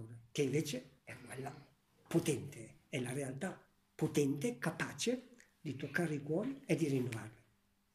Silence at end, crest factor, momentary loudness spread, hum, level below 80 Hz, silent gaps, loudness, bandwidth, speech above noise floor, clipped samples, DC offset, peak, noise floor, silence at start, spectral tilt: 0.6 s; 20 dB; 15 LU; none; -76 dBFS; none; -39 LUFS; 15.5 kHz; 37 dB; under 0.1%; under 0.1%; -20 dBFS; -75 dBFS; 0 s; -5.5 dB/octave